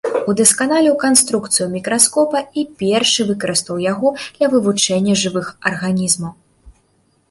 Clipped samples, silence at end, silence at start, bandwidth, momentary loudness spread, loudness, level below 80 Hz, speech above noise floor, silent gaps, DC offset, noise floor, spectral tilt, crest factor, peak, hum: under 0.1%; 0.6 s; 0.05 s; 16 kHz; 8 LU; -15 LUFS; -54 dBFS; 43 dB; none; under 0.1%; -60 dBFS; -3 dB/octave; 16 dB; 0 dBFS; none